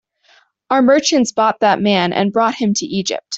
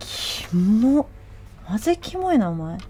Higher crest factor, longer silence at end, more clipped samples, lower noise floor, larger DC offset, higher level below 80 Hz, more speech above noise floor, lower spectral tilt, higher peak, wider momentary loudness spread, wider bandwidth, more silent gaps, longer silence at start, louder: about the same, 14 dB vs 14 dB; about the same, 0 s vs 0 s; neither; first, -54 dBFS vs -41 dBFS; neither; second, -58 dBFS vs -44 dBFS; first, 39 dB vs 21 dB; second, -4 dB/octave vs -6 dB/octave; first, -2 dBFS vs -8 dBFS; second, 6 LU vs 9 LU; second, 8.2 kHz vs 16.5 kHz; neither; first, 0.7 s vs 0 s; first, -15 LUFS vs -21 LUFS